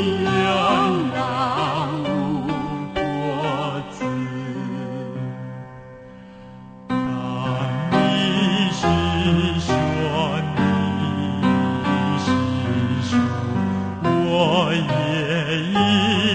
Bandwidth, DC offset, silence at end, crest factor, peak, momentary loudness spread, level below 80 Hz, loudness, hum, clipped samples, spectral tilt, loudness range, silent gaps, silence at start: 9 kHz; under 0.1%; 0 s; 16 dB; -4 dBFS; 12 LU; -44 dBFS; -21 LUFS; none; under 0.1%; -6 dB/octave; 8 LU; none; 0 s